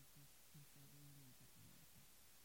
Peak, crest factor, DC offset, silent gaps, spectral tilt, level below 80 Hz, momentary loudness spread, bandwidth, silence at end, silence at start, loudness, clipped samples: -52 dBFS; 14 dB; under 0.1%; none; -3.5 dB/octave; -82 dBFS; 2 LU; 16.5 kHz; 0 s; 0 s; -65 LUFS; under 0.1%